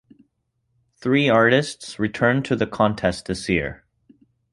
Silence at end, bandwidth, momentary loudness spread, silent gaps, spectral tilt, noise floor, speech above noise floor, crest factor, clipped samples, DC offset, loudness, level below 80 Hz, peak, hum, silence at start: 0.8 s; 11.5 kHz; 12 LU; none; -5.5 dB/octave; -72 dBFS; 51 dB; 20 dB; under 0.1%; under 0.1%; -21 LUFS; -48 dBFS; -2 dBFS; none; 1 s